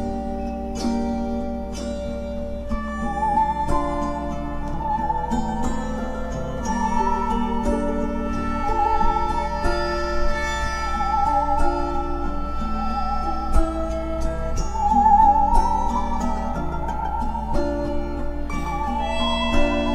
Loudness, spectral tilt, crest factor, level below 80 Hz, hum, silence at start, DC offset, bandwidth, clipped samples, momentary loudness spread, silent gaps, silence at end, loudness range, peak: -24 LUFS; -6 dB/octave; 16 dB; -26 dBFS; none; 0 s; under 0.1%; 11 kHz; under 0.1%; 8 LU; none; 0 s; 5 LU; -4 dBFS